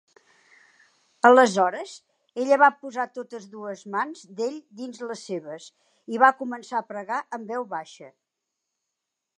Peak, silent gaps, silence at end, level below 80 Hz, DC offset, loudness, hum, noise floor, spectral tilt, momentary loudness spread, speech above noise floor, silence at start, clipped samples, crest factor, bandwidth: -2 dBFS; none; 1.3 s; -86 dBFS; under 0.1%; -23 LUFS; none; -84 dBFS; -4 dB/octave; 20 LU; 59 dB; 1.25 s; under 0.1%; 24 dB; 11 kHz